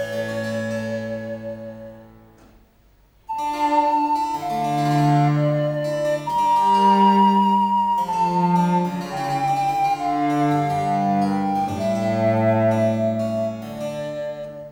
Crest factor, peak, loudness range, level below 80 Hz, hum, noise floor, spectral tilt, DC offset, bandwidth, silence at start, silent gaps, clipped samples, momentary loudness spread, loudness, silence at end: 14 dB; -6 dBFS; 7 LU; -56 dBFS; none; -55 dBFS; -7 dB/octave; under 0.1%; 16.5 kHz; 0 s; none; under 0.1%; 13 LU; -20 LUFS; 0 s